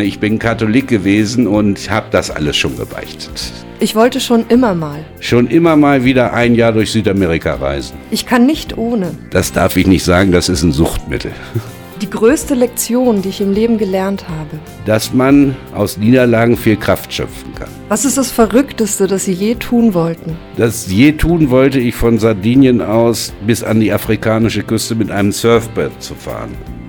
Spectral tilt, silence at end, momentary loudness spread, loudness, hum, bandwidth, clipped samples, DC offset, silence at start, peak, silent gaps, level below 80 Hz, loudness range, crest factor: -5.5 dB/octave; 0 s; 14 LU; -13 LUFS; none; 20 kHz; under 0.1%; under 0.1%; 0 s; 0 dBFS; none; -32 dBFS; 3 LU; 12 dB